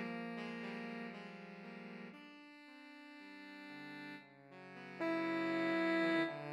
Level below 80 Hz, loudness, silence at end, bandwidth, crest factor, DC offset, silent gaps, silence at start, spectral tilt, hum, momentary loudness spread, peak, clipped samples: under -90 dBFS; -41 LUFS; 0 s; 9.8 kHz; 18 dB; under 0.1%; none; 0 s; -6 dB/octave; none; 20 LU; -24 dBFS; under 0.1%